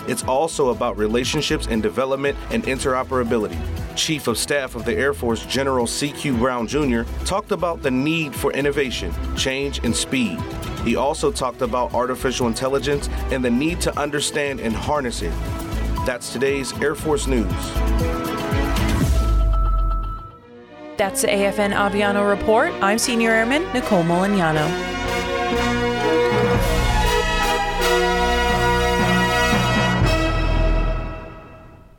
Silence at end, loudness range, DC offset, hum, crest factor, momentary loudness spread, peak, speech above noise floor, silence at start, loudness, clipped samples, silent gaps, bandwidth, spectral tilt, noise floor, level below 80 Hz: 0.2 s; 4 LU; under 0.1%; none; 14 dB; 7 LU; -6 dBFS; 22 dB; 0 s; -20 LUFS; under 0.1%; none; 18 kHz; -4.5 dB/octave; -43 dBFS; -28 dBFS